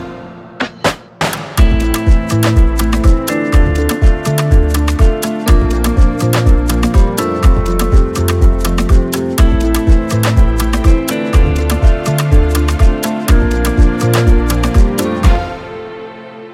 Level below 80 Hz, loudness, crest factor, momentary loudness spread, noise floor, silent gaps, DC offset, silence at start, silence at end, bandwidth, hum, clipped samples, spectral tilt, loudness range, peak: -12 dBFS; -13 LUFS; 10 dB; 6 LU; -30 dBFS; none; under 0.1%; 0 s; 0 s; 16 kHz; none; under 0.1%; -6 dB/octave; 1 LU; 0 dBFS